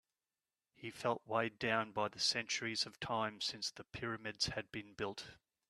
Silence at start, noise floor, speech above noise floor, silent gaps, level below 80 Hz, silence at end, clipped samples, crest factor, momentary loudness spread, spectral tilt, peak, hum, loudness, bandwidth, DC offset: 0.8 s; under -90 dBFS; over 50 dB; none; -70 dBFS; 0.35 s; under 0.1%; 24 dB; 11 LU; -2.5 dB/octave; -18 dBFS; none; -39 LUFS; 13.5 kHz; under 0.1%